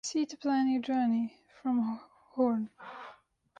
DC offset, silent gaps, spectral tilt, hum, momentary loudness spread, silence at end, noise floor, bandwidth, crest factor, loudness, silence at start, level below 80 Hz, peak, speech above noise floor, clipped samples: under 0.1%; none; -4.5 dB/octave; none; 17 LU; 0.45 s; -59 dBFS; 9.2 kHz; 16 dB; -32 LUFS; 0.05 s; -74 dBFS; -16 dBFS; 29 dB; under 0.1%